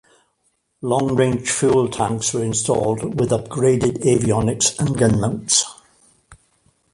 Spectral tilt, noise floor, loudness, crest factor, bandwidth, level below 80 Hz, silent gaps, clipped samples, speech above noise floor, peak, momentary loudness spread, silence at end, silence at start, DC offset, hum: -4.5 dB/octave; -67 dBFS; -19 LUFS; 18 dB; 11.5 kHz; -44 dBFS; none; under 0.1%; 49 dB; -2 dBFS; 4 LU; 0.6 s; 0.8 s; under 0.1%; none